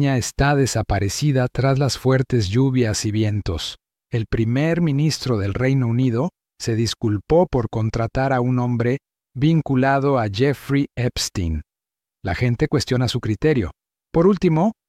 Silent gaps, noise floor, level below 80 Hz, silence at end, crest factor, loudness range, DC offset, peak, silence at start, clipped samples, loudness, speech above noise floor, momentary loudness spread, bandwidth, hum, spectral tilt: none; -89 dBFS; -40 dBFS; 0.15 s; 14 dB; 2 LU; under 0.1%; -4 dBFS; 0 s; under 0.1%; -20 LUFS; 70 dB; 8 LU; 14.5 kHz; none; -6 dB/octave